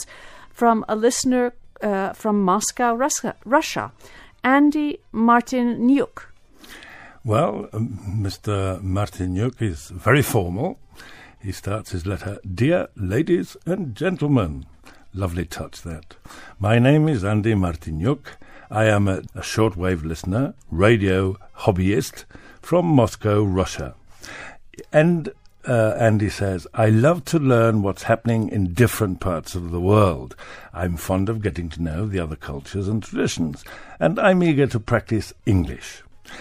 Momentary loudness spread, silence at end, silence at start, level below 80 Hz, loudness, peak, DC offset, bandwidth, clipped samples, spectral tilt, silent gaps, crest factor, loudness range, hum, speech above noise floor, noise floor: 16 LU; 0 s; 0 s; -42 dBFS; -21 LUFS; -2 dBFS; under 0.1%; 15.5 kHz; under 0.1%; -6 dB/octave; none; 18 dB; 5 LU; none; 24 dB; -44 dBFS